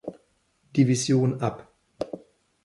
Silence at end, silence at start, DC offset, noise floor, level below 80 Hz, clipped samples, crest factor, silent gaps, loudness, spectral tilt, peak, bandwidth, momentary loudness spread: 0.45 s; 0.05 s; under 0.1%; -67 dBFS; -62 dBFS; under 0.1%; 18 dB; none; -25 LUFS; -6 dB/octave; -8 dBFS; 11.5 kHz; 20 LU